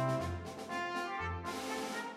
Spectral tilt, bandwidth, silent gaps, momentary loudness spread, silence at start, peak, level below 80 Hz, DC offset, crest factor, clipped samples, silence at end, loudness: -5 dB/octave; 16 kHz; none; 4 LU; 0 s; -24 dBFS; -58 dBFS; under 0.1%; 14 dB; under 0.1%; 0 s; -39 LUFS